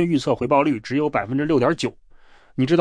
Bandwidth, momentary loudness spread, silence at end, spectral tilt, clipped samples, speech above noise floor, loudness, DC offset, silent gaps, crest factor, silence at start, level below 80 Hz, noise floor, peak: 10.5 kHz; 7 LU; 0 s; -6.5 dB/octave; under 0.1%; 28 dB; -21 LUFS; under 0.1%; none; 16 dB; 0 s; -52 dBFS; -48 dBFS; -6 dBFS